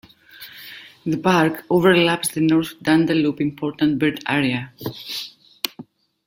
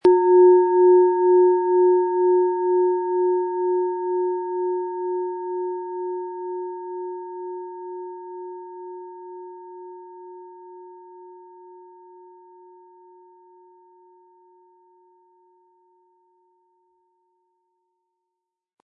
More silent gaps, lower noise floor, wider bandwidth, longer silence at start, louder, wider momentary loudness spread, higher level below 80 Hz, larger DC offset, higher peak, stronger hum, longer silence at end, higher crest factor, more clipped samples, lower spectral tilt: neither; second, -43 dBFS vs -83 dBFS; first, 16.5 kHz vs 1.8 kHz; first, 0.4 s vs 0.05 s; about the same, -20 LUFS vs -20 LUFS; second, 20 LU vs 25 LU; first, -58 dBFS vs -76 dBFS; neither; first, 0 dBFS vs -6 dBFS; neither; second, 0.45 s vs 7.05 s; about the same, 20 dB vs 18 dB; neither; second, -5 dB/octave vs -8 dB/octave